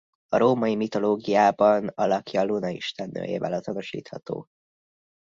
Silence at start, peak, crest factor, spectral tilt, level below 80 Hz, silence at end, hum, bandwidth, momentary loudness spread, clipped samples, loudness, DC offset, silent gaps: 0.3 s; -6 dBFS; 18 dB; -6.5 dB/octave; -66 dBFS; 0.95 s; none; 7.6 kHz; 14 LU; under 0.1%; -24 LUFS; under 0.1%; none